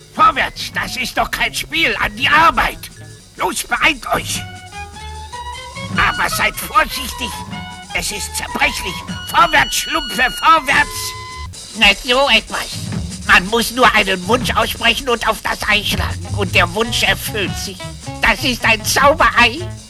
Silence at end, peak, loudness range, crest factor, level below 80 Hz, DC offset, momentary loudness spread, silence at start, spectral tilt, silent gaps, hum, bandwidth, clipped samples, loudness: 0 s; 0 dBFS; 5 LU; 16 dB; -34 dBFS; under 0.1%; 17 LU; 0 s; -2.5 dB/octave; none; none; 15 kHz; under 0.1%; -15 LUFS